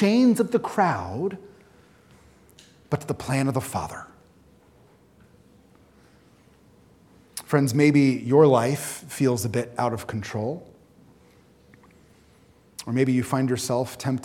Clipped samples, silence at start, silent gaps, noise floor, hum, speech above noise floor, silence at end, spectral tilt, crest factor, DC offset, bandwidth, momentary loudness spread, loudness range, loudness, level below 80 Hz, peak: under 0.1%; 0 s; none; -56 dBFS; none; 34 dB; 0 s; -6 dB/octave; 22 dB; under 0.1%; 17.5 kHz; 15 LU; 11 LU; -23 LUFS; -62 dBFS; -4 dBFS